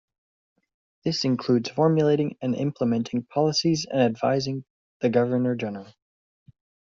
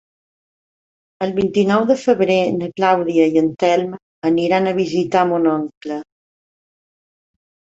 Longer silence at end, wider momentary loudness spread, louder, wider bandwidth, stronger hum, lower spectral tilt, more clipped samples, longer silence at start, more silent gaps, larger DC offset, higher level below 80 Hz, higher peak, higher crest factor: second, 0.95 s vs 1.75 s; about the same, 9 LU vs 10 LU; second, -24 LUFS vs -17 LUFS; about the same, 7.6 kHz vs 8 kHz; neither; about the same, -5.5 dB/octave vs -6.5 dB/octave; neither; second, 1.05 s vs 1.2 s; first, 4.70-5.00 s vs 4.02-4.22 s, 5.77-5.81 s; neither; second, -64 dBFS vs -58 dBFS; second, -8 dBFS vs -2 dBFS; about the same, 18 dB vs 16 dB